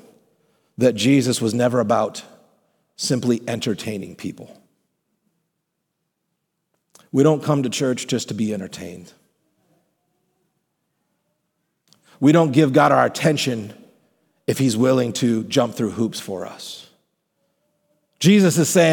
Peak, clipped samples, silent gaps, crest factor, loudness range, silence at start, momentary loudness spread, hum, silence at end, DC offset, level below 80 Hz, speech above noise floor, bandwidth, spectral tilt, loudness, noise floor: -2 dBFS; under 0.1%; none; 20 dB; 11 LU; 0.8 s; 18 LU; none; 0 s; under 0.1%; -68 dBFS; 58 dB; 19 kHz; -5.5 dB/octave; -19 LUFS; -76 dBFS